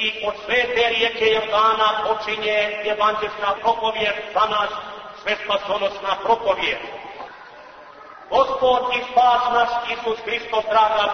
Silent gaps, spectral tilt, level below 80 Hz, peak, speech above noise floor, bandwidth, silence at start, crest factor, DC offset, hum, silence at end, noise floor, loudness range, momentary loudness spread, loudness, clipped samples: none; -3 dB/octave; -54 dBFS; -6 dBFS; 22 dB; 6.6 kHz; 0 s; 16 dB; under 0.1%; none; 0 s; -42 dBFS; 4 LU; 10 LU; -20 LUFS; under 0.1%